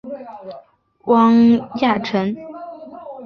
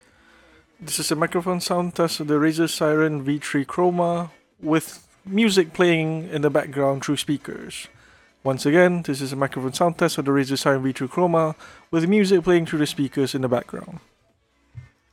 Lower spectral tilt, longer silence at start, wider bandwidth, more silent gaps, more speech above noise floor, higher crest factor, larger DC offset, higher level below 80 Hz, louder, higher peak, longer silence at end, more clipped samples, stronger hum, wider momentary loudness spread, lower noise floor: first, -7.5 dB/octave vs -5 dB/octave; second, 0.05 s vs 0.8 s; second, 6.2 kHz vs 18 kHz; neither; second, 18 dB vs 43 dB; about the same, 16 dB vs 18 dB; neither; about the same, -58 dBFS vs -60 dBFS; first, -16 LUFS vs -22 LUFS; about the same, -2 dBFS vs -4 dBFS; second, 0 s vs 0.3 s; neither; neither; first, 23 LU vs 14 LU; second, -35 dBFS vs -64 dBFS